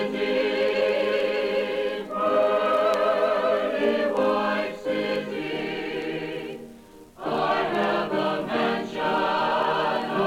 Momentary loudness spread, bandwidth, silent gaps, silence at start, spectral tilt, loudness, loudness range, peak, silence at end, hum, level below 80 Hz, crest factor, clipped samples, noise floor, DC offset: 8 LU; 16.5 kHz; none; 0 s; -5.5 dB/octave; -24 LUFS; 5 LU; -8 dBFS; 0 s; none; -60 dBFS; 16 dB; under 0.1%; -47 dBFS; under 0.1%